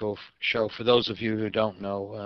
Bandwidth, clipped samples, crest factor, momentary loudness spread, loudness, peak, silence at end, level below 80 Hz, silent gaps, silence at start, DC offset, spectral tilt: 6.2 kHz; under 0.1%; 20 dB; 10 LU; -27 LUFS; -6 dBFS; 0 s; -60 dBFS; none; 0 s; under 0.1%; -6.5 dB/octave